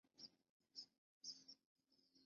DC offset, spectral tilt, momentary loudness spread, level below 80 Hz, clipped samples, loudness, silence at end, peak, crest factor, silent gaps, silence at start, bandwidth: under 0.1%; -0.5 dB/octave; 9 LU; under -90 dBFS; under 0.1%; -60 LUFS; 0 s; -42 dBFS; 22 dB; 0.49-0.60 s, 0.98-1.21 s, 1.66-1.75 s; 0.05 s; 7 kHz